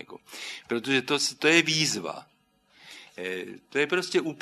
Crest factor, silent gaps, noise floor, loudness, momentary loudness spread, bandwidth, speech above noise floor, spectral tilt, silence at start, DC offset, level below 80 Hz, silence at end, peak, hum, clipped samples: 24 dB; none; -63 dBFS; -25 LUFS; 20 LU; 13.5 kHz; 36 dB; -3 dB/octave; 0 s; under 0.1%; -74 dBFS; 0 s; -4 dBFS; 50 Hz at -65 dBFS; under 0.1%